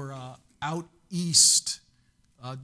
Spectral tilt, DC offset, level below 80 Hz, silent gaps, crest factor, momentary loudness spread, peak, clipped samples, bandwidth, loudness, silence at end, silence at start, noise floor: -1.5 dB/octave; under 0.1%; -66 dBFS; none; 22 dB; 24 LU; -6 dBFS; under 0.1%; 11 kHz; -21 LUFS; 0 s; 0 s; -65 dBFS